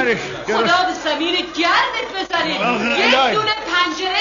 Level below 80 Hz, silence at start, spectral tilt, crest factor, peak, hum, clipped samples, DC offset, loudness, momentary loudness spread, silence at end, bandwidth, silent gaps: -52 dBFS; 0 s; -3 dB/octave; 16 dB; -2 dBFS; none; under 0.1%; under 0.1%; -17 LUFS; 6 LU; 0 s; 7.4 kHz; none